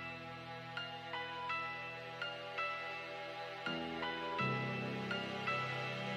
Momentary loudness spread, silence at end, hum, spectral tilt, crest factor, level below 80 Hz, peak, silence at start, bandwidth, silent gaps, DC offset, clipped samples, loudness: 8 LU; 0 s; none; -5.5 dB/octave; 18 dB; -76 dBFS; -24 dBFS; 0 s; 13.5 kHz; none; under 0.1%; under 0.1%; -41 LUFS